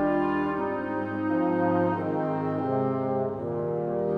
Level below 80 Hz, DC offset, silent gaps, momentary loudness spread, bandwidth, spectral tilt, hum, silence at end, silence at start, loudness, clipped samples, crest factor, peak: -58 dBFS; under 0.1%; none; 5 LU; 5.2 kHz; -10 dB/octave; none; 0 s; 0 s; -27 LUFS; under 0.1%; 16 dB; -12 dBFS